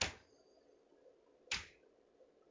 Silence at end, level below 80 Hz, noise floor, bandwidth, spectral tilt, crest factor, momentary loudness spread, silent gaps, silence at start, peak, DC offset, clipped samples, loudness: 0.25 s; -64 dBFS; -69 dBFS; 7.8 kHz; -1 dB/octave; 30 dB; 26 LU; none; 0 s; -20 dBFS; under 0.1%; under 0.1%; -44 LUFS